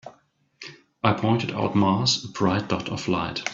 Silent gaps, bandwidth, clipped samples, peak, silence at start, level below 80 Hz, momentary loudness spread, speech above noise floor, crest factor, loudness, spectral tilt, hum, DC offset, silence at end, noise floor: none; 7.8 kHz; under 0.1%; -2 dBFS; 0.05 s; -56 dBFS; 21 LU; 38 dB; 24 dB; -24 LUFS; -5 dB/octave; none; under 0.1%; 0 s; -62 dBFS